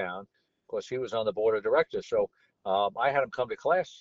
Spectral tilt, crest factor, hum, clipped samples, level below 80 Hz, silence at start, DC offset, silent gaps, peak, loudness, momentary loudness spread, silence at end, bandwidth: -2.5 dB/octave; 16 dB; none; under 0.1%; -68 dBFS; 0 s; under 0.1%; none; -12 dBFS; -29 LUFS; 11 LU; 0.05 s; 7.6 kHz